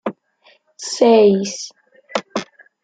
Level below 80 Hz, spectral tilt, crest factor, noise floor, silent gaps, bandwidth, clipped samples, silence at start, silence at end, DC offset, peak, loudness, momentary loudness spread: -66 dBFS; -4.5 dB/octave; 16 dB; -55 dBFS; none; 9.4 kHz; under 0.1%; 0.05 s; 0.4 s; under 0.1%; -2 dBFS; -17 LUFS; 19 LU